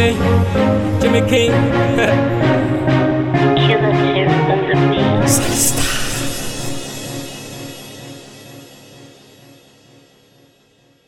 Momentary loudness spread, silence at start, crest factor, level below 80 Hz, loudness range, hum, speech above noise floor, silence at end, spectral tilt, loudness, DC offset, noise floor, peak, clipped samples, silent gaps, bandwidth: 17 LU; 0 s; 16 dB; -36 dBFS; 17 LU; none; 40 dB; 2 s; -5 dB/octave; -15 LUFS; under 0.1%; -54 dBFS; 0 dBFS; under 0.1%; none; 16.5 kHz